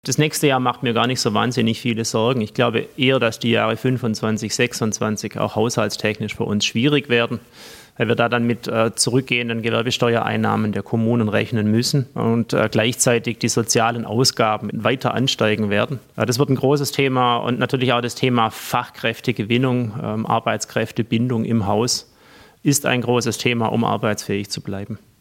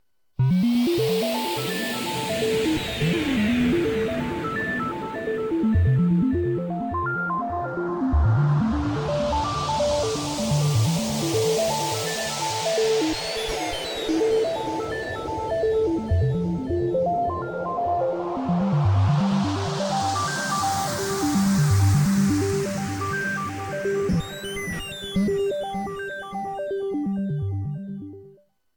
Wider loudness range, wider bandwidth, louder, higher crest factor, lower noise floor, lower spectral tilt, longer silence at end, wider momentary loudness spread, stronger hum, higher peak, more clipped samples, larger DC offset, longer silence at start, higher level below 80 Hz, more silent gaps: about the same, 2 LU vs 4 LU; second, 16.5 kHz vs 19 kHz; first, -19 LUFS vs -24 LUFS; first, 18 dB vs 12 dB; second, -48 dBFS vs -54 dBFS; about the same, -4.5 dB/octave vs -5.5 dB/octave; second, 0.25 s vs 0.45 s; about the same, 6 LU vs 8 LU; neither; first, -2 dBFS vs -10 dBFS; neither; neither; second, 0.05 s vs 0.4 s; second, -60 dBFS vs -40 dBFS; neither